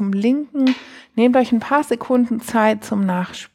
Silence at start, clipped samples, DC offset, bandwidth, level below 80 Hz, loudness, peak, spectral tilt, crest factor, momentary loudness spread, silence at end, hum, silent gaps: 0 s; under 0.1%; under 0.1%; 14.5 kHz; -62 dBFS; -18 LUFS; -4 dBFS; -6 dB/octave; 14 dB; 5 LU; 0.1 s; none; none